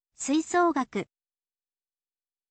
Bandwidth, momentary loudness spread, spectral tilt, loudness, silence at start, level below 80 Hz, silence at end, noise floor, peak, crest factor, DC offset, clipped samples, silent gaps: 9 kHz; 12 LU; -4 dB/octave; -27 LUFS; 0.2 s; -72 dBFS; 1.45 s; under -90 dBFS; -14 dBFS; 16 dB; under 0.1%; under 0.1%; none